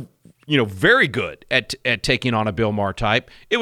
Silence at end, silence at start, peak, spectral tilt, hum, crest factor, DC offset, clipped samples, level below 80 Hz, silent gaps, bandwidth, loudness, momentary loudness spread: 0 s; 0 s; -2 dBFS; -5 dB/octave; none; 18 dB; under 0.1%; under 0.1%; -42 dBFS; none; 16 kHz; -19 LUFS; 7 LU